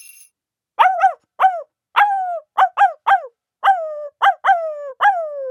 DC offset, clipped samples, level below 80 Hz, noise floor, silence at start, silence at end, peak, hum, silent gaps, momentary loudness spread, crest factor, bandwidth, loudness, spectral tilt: under 0.1%; under 0.1%; -86 dBFS; -75 dBFS; 0.8 s; 0 s; 0 dBFS; none; none; 9 LU; 18 dB; 16.5 kHz; -17 LUFS; 1.5 dB/octave